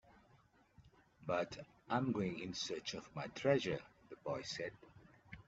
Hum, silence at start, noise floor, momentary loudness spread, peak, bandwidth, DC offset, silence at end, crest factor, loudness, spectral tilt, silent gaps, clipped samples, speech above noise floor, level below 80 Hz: none; 0.8 s; -70 dBFS; 15 LU; -20 dBFS; 8 kHz; under 0.1%; 0.05 s; 24 dB; -41 LUFS; -4 dB/octave; none; under 0.1%; 30 dB; -72 dBFS